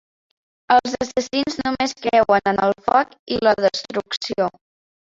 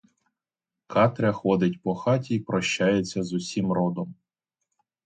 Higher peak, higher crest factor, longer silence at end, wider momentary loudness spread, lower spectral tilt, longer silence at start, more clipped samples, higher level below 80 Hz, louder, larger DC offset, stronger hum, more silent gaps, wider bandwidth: first, -2 dBFS vs -6 dBFS; about the same, 18 dB vs 20 dB; second, 0.65 s vs 0.95 s; about the same, 8 LU vs 6 LU; second, -4 dB/octave vs -6 dB/octave; second, 0.7 s vs 0.9 s; neither; first, -54 dBFS vs -60 dBFS; first, -20 LUFS vs -25 LUFS; neither; neither; first, 3.19-3.27 s vs none; second, 7.8 kHz vs 9.2 kHz